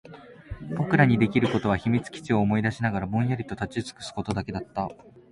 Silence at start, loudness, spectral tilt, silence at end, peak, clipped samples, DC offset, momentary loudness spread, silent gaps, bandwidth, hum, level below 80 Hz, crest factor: 0.05 s; -26 LUFS; -7 dB/octave; 0.1 s; -6 dBFS; under 0.1%; under 0.1%; 14 LU; none; 11.5 kHz; none; -48 dBFS; 20 dB